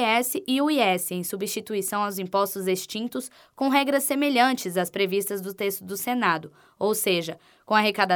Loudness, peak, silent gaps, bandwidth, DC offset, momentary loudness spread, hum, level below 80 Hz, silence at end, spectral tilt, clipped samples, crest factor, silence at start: -25 LUFS; -6 dBFS; none; over 20 kHz; under 0.1%; 9 LU; none; -76 dBFS; 0 s; -3.5 dB/octave; under 0.1%; 18 dB; 0 s